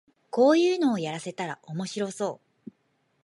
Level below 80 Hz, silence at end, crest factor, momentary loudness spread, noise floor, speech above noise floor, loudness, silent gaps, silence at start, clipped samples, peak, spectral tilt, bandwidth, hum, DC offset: -80 dBFS; 0.9 s; 18 dB; 14 LU; -71 dBFS; 46 dB; -26 LUFS; none; 0.35 s; under 0.1%; -10 dBFS; -5.5 dB/octave; 11.5 kHz; none; under 0.1%